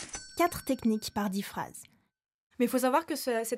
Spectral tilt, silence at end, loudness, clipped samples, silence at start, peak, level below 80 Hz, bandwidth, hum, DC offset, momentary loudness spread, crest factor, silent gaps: -4 dB/octave; 0 s; -31 LUFS; under 0.1%; 0 s; -14 dBFS; -62 dBFS; 16 kHz; none; under 0.1%; 12 LU; 18 dB; 2.34-2.50 s